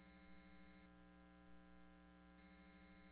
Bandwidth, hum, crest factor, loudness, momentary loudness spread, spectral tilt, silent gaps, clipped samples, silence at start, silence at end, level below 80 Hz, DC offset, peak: 4 kHz; none; 12 dB; -67 LUFS; 2 LU; -5 dB/octave; none; under 0.1%; 0 s; 0 s; -74 dBFS; under 0.1%; -52 dBFS